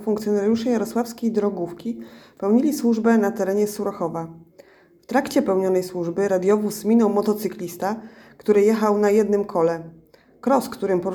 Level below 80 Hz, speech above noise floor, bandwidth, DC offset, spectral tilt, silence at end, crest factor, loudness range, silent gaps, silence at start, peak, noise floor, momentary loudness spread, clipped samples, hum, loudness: -62 dBFS; 30 dB; 19 kHz; under 0.1%; -6 dB/octave; 0 s; 16 dB; 3 LU; none; 0 s; -6 dBFS; -51 dBFS; 11 LU; under 0.1%; none; -21 LUFS